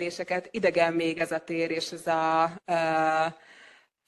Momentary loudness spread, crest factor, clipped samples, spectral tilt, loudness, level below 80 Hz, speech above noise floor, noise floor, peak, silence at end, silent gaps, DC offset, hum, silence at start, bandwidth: 7 LU; 18 dB; under 0.1%; -4.5 dB/octave; -27 LUFS; -72 dBFS; 29 dB; -56 dBFS; -8 dBFS; 0.4 s; none; under 0.1%; none; 0 s; 12.5 kHz